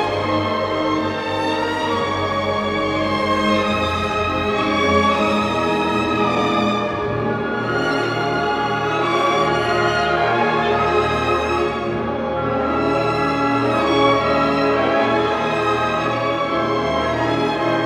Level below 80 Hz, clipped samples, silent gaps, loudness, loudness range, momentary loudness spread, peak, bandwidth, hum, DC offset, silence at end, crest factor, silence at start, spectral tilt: -44 dBFS; under 0.1%; none; -19 LUFS; 2 LU; 4 LU; -4 dBFS; 13.5 kHz; none; under 0.1%; 0 s; 16 dB; 0 s; -5.5 dB/octave